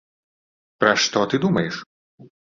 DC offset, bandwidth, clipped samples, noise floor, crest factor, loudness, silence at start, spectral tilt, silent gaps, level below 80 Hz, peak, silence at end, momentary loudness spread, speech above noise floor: under 0.1%; 7.6 kHz; under 0.1%; under -90 dBFS; 22 dB; -20 LUFS; 0.8 s; -4 dB/octave; 1.86-2.18 s; -60 dBFS; -2 dBFS; 0.25 s; 10 LU; over 70 dB